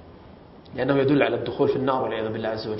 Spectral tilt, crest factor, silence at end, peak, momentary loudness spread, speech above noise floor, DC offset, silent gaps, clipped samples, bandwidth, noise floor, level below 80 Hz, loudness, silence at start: -11 dB/octave; 20 dB; 0 s; -4 dBFS; 8 LU; 23 dB; under 0.1%; none; under 0.1%; 5.8 kHz; -46 dBFS; -56 dBFS; -23 LUFS; 0 s